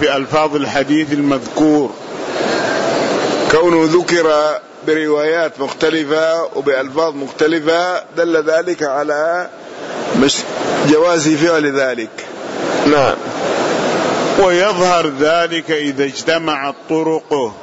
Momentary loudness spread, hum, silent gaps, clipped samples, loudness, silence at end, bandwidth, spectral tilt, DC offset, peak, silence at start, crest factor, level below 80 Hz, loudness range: 7 LU; none; none; under 0.1%; -15 LUFS; 0 s; 8 kHz; -4 dB/octave; under 0.1%; -2 dBFS; 0 s; 12 dB; -52 dBFS; 2 LU